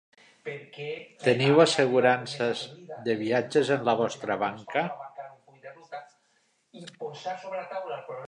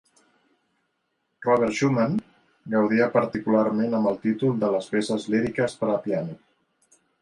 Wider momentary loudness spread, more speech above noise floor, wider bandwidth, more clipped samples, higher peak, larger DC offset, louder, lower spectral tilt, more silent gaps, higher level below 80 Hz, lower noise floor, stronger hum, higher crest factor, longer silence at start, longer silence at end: first, 22 LU vs 6 LU; second, 43 dB vs 52 dB; about the same, 10.5 kHz vs 11 kHz; neither; about the same, -6 dBFS vs -6 dBFS; neither; second, -27 LUFS vs -24 LUFS; second, -5 dB/octave vs -6.5 dB/octave; neither; second, -76 dBFS vs -62 dBFS; second, -70 dBFS vs -75 dBFS; neither; about the same, 22 dB vs 20 dB; second, 0.45 s vs 1.4 s; second, 0 s vs 0.85 s